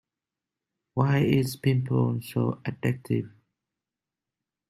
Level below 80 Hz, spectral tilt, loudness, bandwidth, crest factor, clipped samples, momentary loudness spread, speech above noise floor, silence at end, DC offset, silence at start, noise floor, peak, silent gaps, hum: -62 dBFS; -7.5 dB/octave; -27 LUFS; 14.5 kHz; 20 dB; under 0.1%; 7 LU; 64 dB; 1.4 s; under 0.1%; 0.95 s; -89 dBFS; -8 dBFS; none; none